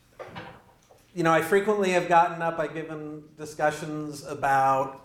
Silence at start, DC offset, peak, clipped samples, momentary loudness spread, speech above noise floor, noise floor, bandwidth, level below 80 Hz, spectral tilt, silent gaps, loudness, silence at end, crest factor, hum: 0.2 s; under 0.1%; -8 dBFS; under 0.1%; 19 LU; 32 dB; -57 dBFS; 16.5 kHz; -62 dBFS; -5 dB/octave; none; -25 LUFS; 0.05 s; 18 dB; none